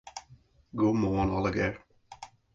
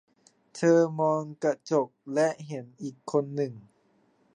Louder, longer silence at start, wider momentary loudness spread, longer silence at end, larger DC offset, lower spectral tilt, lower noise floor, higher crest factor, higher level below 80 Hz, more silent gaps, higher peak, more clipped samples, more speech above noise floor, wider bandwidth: about the same, -29 LUFS vs -28 LUFS; second, 0.05 s vs 0.55 s; first, 22 LU vs 16 LU; second, 0.3 s vs 0.75 s; neither; about the same, -7 dB/octave vs -6.5 dB/octave; second, -59 dBFS vs -67 dBFS; about the same, 16 dB vs 18 dB; first, -48 dBFS vs -82 dBFS; neither; second, -16 dBFS vs -10 dBFS; neither; second, 31 dB vs 40 dB; second, 7.8 kHz vs 10 kHz